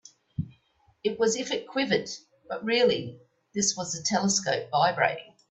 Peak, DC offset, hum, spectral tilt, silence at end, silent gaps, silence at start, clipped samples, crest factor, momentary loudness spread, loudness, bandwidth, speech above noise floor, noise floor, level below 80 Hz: -10 dBFS; under 0.1%; none; -3 dB/octave; 0.25 s; none; 0.4 s; under 0.1%; 20 dB; 16 LU; -27 LUFS; 8.4 kHz; 39 dB; -66 dBFS; -64 dBFS